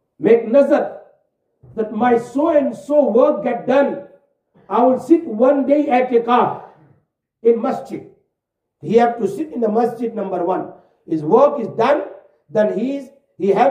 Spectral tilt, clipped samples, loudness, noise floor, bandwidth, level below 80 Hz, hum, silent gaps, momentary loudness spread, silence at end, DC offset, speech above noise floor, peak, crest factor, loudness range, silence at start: -7.5 dB/octave; under 0.1%; -17 LUFS; -78 dBFS; 10 kHz; -66 dBFS; none; none; 12 LU; 0 s; under 0.1%; 62 dB; 0 dBFS; 16 dB; 4 LU; 0.2 s